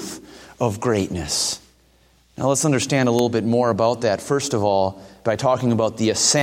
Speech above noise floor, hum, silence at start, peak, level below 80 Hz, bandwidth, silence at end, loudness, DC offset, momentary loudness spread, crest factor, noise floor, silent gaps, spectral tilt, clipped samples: 37 dB; none; 0 s; -4 dBFS; -52 dBFS; 16.5 kHz; 0 s; -20 LUFS; under 0.1%; 7 LU; 16 dB; -57 dBFS; none; -4 dB/octave; under 0.1%